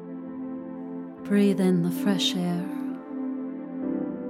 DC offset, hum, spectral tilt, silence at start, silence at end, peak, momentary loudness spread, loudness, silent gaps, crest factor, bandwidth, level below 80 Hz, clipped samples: under 0.1%; none; -6 dB/octave; 0 s; 0 s; -12 dBFS; 14 LU; -27 LUFS; none; 16 dB; 15.5 kHz; -70 dBFS; under 0.1%